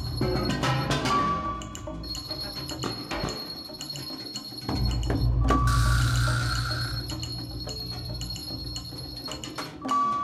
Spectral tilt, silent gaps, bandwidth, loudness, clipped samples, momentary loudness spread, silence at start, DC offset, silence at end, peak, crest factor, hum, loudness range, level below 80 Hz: -5 dB/octave; none; 15.5 kHz; -29 LUFS; under 0.1%; 11 LU; 0 s; under 0.1%; 0 s; -10 dBFS; 18 dB; none; 6 LU; -34 dBFS